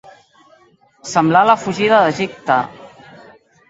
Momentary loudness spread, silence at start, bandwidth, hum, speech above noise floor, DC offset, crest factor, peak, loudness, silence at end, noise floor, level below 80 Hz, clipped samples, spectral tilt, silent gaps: 11 LU; 1.05 s; 8 kHz; none; 38 dB; under 0.1%; 18 dB; 0 dBFS; -15 LUFS; 0.85 s; -52 dBFS; -58 dBFS; under 0.1%; -5 dB/octave; none